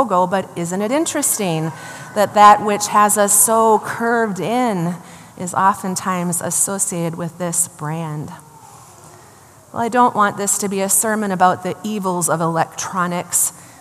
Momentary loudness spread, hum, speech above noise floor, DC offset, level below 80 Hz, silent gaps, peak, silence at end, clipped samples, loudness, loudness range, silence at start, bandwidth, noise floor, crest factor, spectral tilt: 14 LU; none; 27 dB; under 0.1%; -66 dBFS; none; 0 dBFS; 0.15 s; under 0.1%; -17 LUFS; 7 LU; 0 s; 15 kHz; -45 dBFS; 18 dB; -3.5 dB/octave